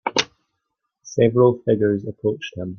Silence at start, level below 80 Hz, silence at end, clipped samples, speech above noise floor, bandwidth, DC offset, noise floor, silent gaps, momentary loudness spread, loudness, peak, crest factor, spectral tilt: 0.05 s; -56 dBFS; 0 s; under 0.1%; 58 dB; 7.2 kHz; under 0.1%; -77 dBFS; none; 13 LU; -20 LUFS; -2 dBFS; 18 dB; -5.5 dB/octave